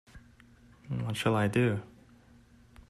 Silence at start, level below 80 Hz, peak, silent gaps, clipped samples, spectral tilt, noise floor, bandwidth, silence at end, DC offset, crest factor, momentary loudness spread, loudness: 0.15 s; -60 dBFS; -14 dBFS; none; under 0.1%; -6.5 dB/octave; -59 dBFS; 13.5 kHz; 1.05 s; under 0.1%; 18 dB; 11 LU; -30 LUFS